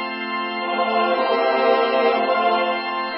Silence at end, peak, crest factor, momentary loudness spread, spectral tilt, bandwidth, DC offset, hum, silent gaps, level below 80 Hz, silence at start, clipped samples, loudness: 0 s; -6 dBFS; 14 dB; 7 LU; -8 dB/octave; 5.6 kHz; under 0.1%; none; none; -70 dBFS; 0 s; under 0.1%; -19 LUFS